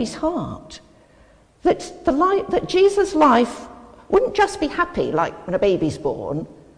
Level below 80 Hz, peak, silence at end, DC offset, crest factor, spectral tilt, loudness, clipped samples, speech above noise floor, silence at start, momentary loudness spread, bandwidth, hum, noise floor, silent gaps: -46 dBFS; -4 dBFS; 0.25 s; under 0.1%; 16 dB; -5.5 dB/octave; -20 LUFS; under 0.1%; 33 dB; 0 s; 12 LU; 10.5 kHz; none; -52 dBFS; none